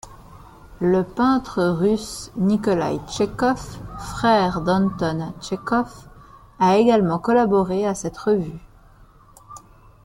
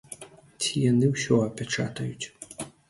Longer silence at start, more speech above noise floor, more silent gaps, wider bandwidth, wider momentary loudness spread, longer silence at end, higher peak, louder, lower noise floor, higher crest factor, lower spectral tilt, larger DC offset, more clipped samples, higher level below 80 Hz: about the same, 0.05 s vs 0.1 s; first, 29 dB vs 21 dB; neither; first, 14 kHz vs 12 kHz; second, 12 LU vs 16 LU; first, 0.45 s vs 0.2 s; first, -4 dBFS vs -8 dBFS; first, -21 LUFS vs -26 LUFS; about the same, -49 dBFS vs -46 dBFS; about the same, 18 dB vs 20 dB; first, -6.5 dB/octave vs -5 dB/octave; neither; neither; first, -46 dBFS vs -60 dBFS